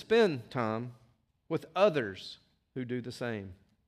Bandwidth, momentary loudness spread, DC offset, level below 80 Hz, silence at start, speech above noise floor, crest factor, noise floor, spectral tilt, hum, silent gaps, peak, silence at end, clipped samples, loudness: 12.5 kHz; 19 LU; under 0.1%; -72 dBFS; 0 s; 37 dB; 20 dB; -68 dBFS; -6.5 dB/octave; none; none; -14 dBFS; 0.35 s; under 0.1%; -32 LUFS